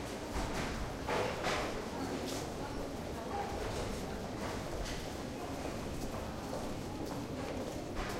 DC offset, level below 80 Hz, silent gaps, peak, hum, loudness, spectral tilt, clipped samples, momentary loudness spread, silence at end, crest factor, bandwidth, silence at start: under 0.1%; -48 dBFS; none; -22 dBFS; none; -40 LUFS; -4.5 dB/octave; under 0.1%; 6 LU; 0 s; 16 dB; 16 kHz; 0 s